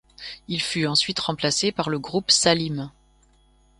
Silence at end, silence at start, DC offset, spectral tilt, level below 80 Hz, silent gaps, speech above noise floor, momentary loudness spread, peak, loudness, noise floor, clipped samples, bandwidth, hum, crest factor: 0.9 s; 0.2 s; under 0.1%; -3 dB/octave; -56 dBFS; none; 35 dB; 16 LU; -4 dBFS; -22 LUFS; -59 dBFS; under 0.1%; 11.5 kHz; none; 20 dB